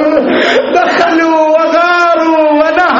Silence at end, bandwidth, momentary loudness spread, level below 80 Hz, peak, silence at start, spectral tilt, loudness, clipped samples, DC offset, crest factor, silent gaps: 0 s; 7.6 kHz; 1 LU; -48 dBFS; 0 dBFS; 0 s; -4 dB/octave; -8 LUFS; under 0.1%; under 0.1%; 8 dB; none